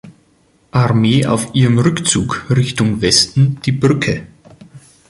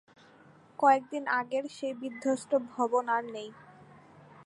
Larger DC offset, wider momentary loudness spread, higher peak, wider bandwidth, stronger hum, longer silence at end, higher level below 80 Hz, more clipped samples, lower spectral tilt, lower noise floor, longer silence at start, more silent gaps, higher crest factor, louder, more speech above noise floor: neither; second, 6 LU vs 16 LU; first, 0 dBFS vs -10 dBFS; about the same, 11.5 kHz vs 11.5 kHz; neither; first, 0.3 s vs 0.05 s; first, -42 dBFS vs -82 dBFS; neither; about the same, -5 dB/octave vs -4 dB/octave; second, -54 dBFS vs -58 dBFS; second, 0.05 s vs 0.8 s; neither; second, 16 dB vs 22 dB; first, -14 LUFS vs -30 LUFS; first, 41 dB vs 28 dB